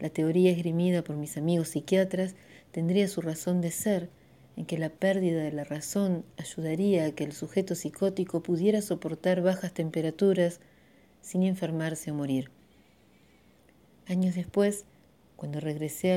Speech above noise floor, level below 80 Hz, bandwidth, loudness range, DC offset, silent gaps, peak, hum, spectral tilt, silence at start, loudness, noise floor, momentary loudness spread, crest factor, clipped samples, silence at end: 33 dB; -68 dBFS; 16.5 kHz; 5 LU; under 0.1%; none; -12 dBFS; none; -6.5 dB/octave; 0 s; -29 LUFS; -61 dBFS; 9 LU; 18 dB; under 0.1%; 0 s